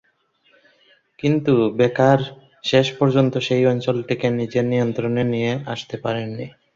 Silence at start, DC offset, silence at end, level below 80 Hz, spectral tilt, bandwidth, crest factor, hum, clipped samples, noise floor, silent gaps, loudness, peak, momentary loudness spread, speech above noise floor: 1.25 s; under 0.1%; 0.25 s; -58 dBFS; -7 dB/octave; 7.6 kHz; 18 dB; none; under 0.1%; -62 dBFS; none; -20 LUFS; -2 dBFS; 10 LU; 43 dB